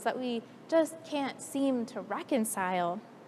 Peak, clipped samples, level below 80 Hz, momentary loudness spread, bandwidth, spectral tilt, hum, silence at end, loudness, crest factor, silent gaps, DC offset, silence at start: -14 dBFS; under 0.1%; -88 dBFS; 7 LU; 15 kHz; -4 dB/octave; none; 0 s; -32 LUFS; 18 dB; none; under 0.1%; 0 s